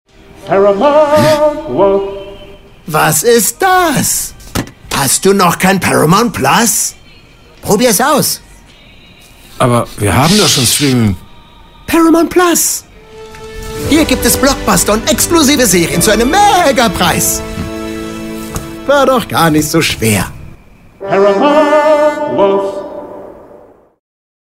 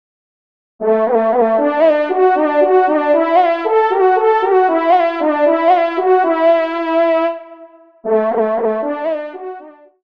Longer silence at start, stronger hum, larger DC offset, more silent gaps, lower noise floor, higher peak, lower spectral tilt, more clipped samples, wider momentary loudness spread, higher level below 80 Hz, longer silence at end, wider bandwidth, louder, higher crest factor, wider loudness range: second, 0.45 s vs 0.8 s; neither; second, under 0.1% vs 0.3%; neither; about the same, -39 dBFS vs -41 dBFS; about the same, 0 dBFS vs -2 dBFS; second, -3.5 dB/octave vs -7 dB/octave; neither; first, 14 LU vs 9 LU; first, -32 dBFS vs -68 dBFS; first, 1.2 s vs 0.35 s; first, 16.5 kHz vs 5.8 kHz; first, -10 LUFS vs -14 LUFS; about the same, 12 dB vs 12 dB; about the same, 4 LU vs 4 LU